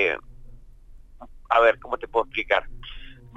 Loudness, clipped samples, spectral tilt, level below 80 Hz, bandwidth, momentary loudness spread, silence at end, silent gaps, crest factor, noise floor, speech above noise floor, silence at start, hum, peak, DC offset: -23 LUFS; under 0.1%; -4.5 dB/octave; -44 dBFS; 7.8 kHz; 22 LU; 0.25 s; none; 20 dB; -46 dBFS; 22 dB; 0 s; none; -6 dBFS; under 0.1%